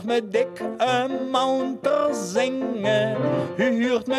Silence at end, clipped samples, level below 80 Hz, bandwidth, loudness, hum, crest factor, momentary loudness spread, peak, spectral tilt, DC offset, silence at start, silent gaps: 0 s; under 0.1%; -68 dBFS; 13.5 kHz; -23 LUFS; none; 14 dB; 3 LU; -10 dBFS; -5 dB/octave; under 0.1%; 0 s; none